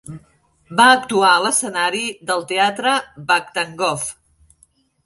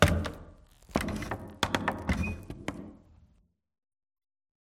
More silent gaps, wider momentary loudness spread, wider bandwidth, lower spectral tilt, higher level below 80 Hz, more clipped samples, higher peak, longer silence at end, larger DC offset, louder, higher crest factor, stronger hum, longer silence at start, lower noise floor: neither; second, 12 LU vs 17 LU; second, 12 kHz vs 16.5 kHz; second, -2 dB/octave vs -5 dB/octave; second, -60 dBFS vs -44 dBFS; neither; first, -2 dBFS vs -6 dBFS; second, 0.95 s vs 1.7 s; neither; first, -17 LUFS vs -33 LUFS; second, 18 dB vs 28 dB; neither; about the same, 0.1 s vs 0 s; second, -58 dBFS vs -68 dBFS